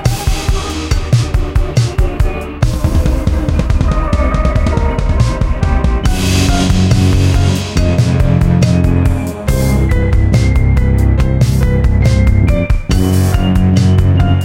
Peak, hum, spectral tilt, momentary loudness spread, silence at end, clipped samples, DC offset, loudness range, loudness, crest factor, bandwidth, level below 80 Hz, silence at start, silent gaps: 0 dBFS; none; -6.5 dB/octave; 5 LU; 0 s; under 0.1%; under 0.1%; 3 LU; -13 LUFS; 10 dB; 16.5 kHz; -14 dBFS; 0 s; none